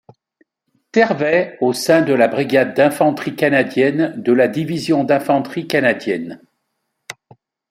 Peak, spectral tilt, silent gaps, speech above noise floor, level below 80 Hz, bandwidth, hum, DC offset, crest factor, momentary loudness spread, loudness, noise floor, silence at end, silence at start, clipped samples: -2 dBFS; -5.5 dB/octave; none; 57 dB; -62 dBFS; 16 kHz; none; under 0.1%; 16 dB; 9 LU; -16 LUFS; -73 dBFS; 0.6 s; 0.95 s; under 0.1%